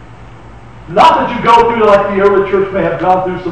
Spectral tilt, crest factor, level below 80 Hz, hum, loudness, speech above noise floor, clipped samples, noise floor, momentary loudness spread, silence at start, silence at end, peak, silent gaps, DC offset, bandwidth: -6 dB/octave; 10 dB; -36 dBFS; none; -10 LUFS; 24 dB; under 0.1%; -34 dBFS; 6 LU; 0 s; 0 s; 0 dBFS; none; 0.9%; 9.2 kHz